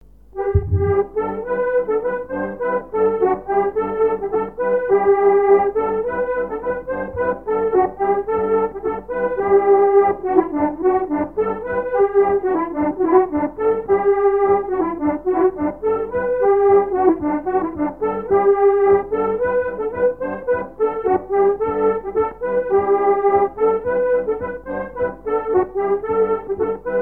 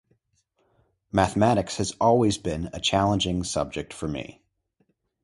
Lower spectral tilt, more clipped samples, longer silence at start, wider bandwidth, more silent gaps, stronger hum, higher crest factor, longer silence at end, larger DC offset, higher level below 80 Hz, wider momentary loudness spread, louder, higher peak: first, -10.5 dB/octave vs -5 dB/octave; neither; second, 0.35 s vs 1.15 s; second, 3.3 kHz vs 11.5 kHz; neither; neither; about the same, 18 dB vs 20 dB; second, 0 s vs 0.9 s; first, 0.4% vs under 0.1%; about the same, -42 dBFS vs -46 dBFS; about the same, 9 LU vs 11 LU; first, -19 LUFS vs -24 LUFS; first, 0 dBFS vs -6 dBFS